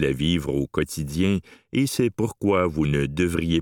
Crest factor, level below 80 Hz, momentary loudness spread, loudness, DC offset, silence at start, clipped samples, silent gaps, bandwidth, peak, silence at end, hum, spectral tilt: 16 dB; -42 dBFS; 5 LU; -24 LUFS; under 0.1%; 0 s; under 0.1%; none; 18 kHz; -6 dBFS; 0 s; none; -6 dB/octave